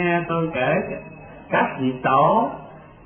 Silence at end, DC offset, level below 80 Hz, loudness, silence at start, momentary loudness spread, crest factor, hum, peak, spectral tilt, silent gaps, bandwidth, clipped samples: 0.15 s; under 0.1%; -52 dBFS; -21 LUFS; 0 s; 19 LU; 16 dB; none; -6 dBFS; -11.5 dB/octave; none; 3.5 kHz; under 0.1%